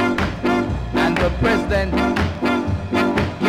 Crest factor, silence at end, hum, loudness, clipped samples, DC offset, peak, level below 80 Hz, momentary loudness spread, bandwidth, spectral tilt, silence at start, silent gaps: 12 dB; 0 s; none; -19 LUFS; under 0.1%; under 0.1%; -6 dBFS; -30 dBFS; 3 LU; 15.5 kHz; -6.5 dB/octave; 0 s; none